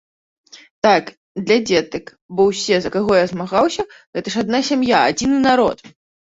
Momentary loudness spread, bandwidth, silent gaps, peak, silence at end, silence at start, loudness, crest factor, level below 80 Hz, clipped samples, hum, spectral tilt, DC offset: 13 LU; 8 kHz; 0.71-0.82 s, 1.17-1.35 s, 2.21-2.29 s, 4.07-4.13 s; -2 dBFS; 0.4 s; 0.55 s; -17 LUFS; 16 dB; -52 dBFS; under 0.1%; none; -4.5 dB/octave; under 0.1%